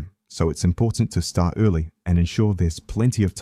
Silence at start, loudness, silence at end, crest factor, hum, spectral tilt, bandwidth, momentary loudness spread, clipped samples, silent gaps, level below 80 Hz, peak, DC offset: 0 s; -22 LUFS; 0 s; 16 dB; none; -6.5 dB/octave; 13 kHz; 5 LU; under 0.1%; none; -34 dBFS; -6 dBFS; under 0.1%